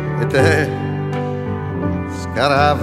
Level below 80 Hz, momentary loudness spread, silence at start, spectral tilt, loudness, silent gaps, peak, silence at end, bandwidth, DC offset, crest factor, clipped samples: -40 dBFS; 9 LU; 0 s; -6.5 dB/octave; -18 LUFS; none; 0 dBFS; 0 s; 14 kHz; under 0.1%; 16 dB; under 0.1%